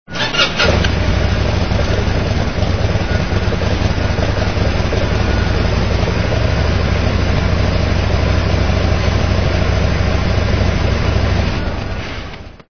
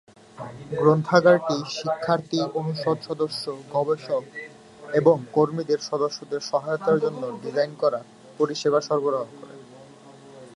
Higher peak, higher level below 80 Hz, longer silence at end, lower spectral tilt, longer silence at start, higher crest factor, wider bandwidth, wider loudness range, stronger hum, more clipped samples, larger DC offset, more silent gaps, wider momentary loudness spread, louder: about the same, 0 dBFS vs -2 dBFS; first, -20 dBFS vs -68 dBFS; about the same, 0 s vs 0.05 s; about the same, -6 dB/octave vs -6 dB/octave; second, 0.05 s vs 0.35 s; second, 14 dB vs 22 dB; second, 6.6 kHz vs 11.5 kHz; second, 1 LU vs 4 LU; neither; neither; first, 4% vs under 0.1%; neither; second, 2 LU vs 14 LU; first, -16 LUFS vs -24 LUFS